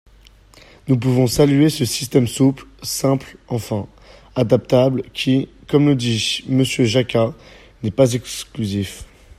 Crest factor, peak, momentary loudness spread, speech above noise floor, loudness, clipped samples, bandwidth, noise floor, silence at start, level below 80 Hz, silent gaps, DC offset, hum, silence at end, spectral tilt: 18 dB; 0 dBFS; 12 LU; 30 dB; -18 LUFS; under 0.1%; 15.5 kHz; -48 dBFS; 0.85 s; -46 dBFS; none; under 0.1%; none; 0.35 s; -5.5 dB/octave